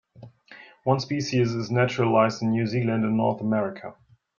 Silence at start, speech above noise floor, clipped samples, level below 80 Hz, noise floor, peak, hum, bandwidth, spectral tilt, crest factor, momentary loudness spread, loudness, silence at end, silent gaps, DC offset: 0.2 s; 26 dB; under 0.1%; -62 dBFS; -50 dBFS; -6 dBFS; none; 7.2 kHz; -6.5 dB/octave; 18 dB; 9 LU; -24 LUFS; 0.45 s; none; under 0.1%